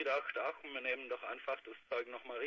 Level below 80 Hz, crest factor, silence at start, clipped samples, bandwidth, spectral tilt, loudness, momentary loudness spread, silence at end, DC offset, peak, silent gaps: -84 dBFS; 18 dB; 0 s; under 0.1%; 7.2 kHz; 1.5 dB/octave; -41 LUFS; 6 LU; 0 s; under 0.1%; -24 dBFS; none